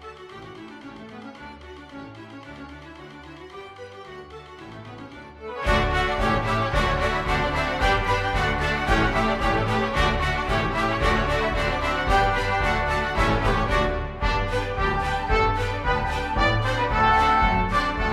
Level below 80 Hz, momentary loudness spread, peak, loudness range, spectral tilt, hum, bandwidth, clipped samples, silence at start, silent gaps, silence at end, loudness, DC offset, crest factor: -30 dBFS; 20 LU; -8 dBFS; 18 LU; -5.5 dB/octave; none; 13.5 kHz; under 0.1%; 0 s; none; 0 s; -23 LUFS; under 0.1%; 16 dB